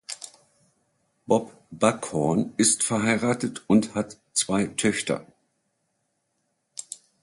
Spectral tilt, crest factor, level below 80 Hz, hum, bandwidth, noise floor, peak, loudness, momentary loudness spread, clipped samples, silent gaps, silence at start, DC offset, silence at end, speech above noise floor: -4 dB/octave; 22 dB; -62 dBFS; none; 11.5 kHz; -75 dBFS; -4 dBFS; -24 LUFS; 17 LU; under 0.1%; none; 0.1 s; under 0.1%; 0.25 s; 51 dB